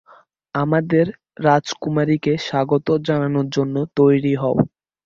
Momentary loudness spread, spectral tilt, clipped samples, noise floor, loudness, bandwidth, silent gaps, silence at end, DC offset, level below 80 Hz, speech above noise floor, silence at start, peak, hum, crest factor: 6 LU; -7 dB/octave; under 0.1%; -51 dBFS; -19 LUFS; 7.6 kHz; none; 0.4 s; under 0.1%; -56 dBFS; 33 dB; 0.55 s; -2 dBFS; none; 18 dB